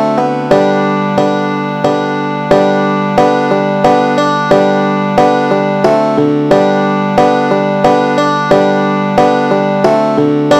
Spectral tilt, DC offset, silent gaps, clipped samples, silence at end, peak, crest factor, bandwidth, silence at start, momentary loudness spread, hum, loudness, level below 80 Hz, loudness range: -6.5 dB/octave; under 0.1%; none; 0.3%; 0 s; 0 dBFS; 10 dB; 12 kHz; 0 s; 3 LU; none; -11 LUFS; -46 dBFS; 1 LU